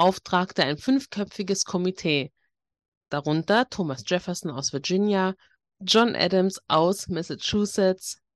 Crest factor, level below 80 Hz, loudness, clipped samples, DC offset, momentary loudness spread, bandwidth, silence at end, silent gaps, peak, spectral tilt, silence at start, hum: 18 dB; -62 dBFS; -25 LUFS; under 0.1%; under 0.1%; 9 LU; 12.5 kHz; 0.2 s; 2.88-3.01 s; -6 dBFS; -4.5 dB/octave; 0 s; none